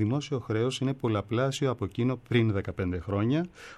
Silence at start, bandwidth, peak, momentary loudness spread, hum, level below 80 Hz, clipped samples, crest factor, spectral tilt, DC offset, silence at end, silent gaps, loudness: 0 s; 12 kHz; -12 dBFS; 5 LU; none; -56 dBFS; under 0.1%; 16 dB; -6.5 dB/octave; under 0.1%; 0 s; none; -29 LUFS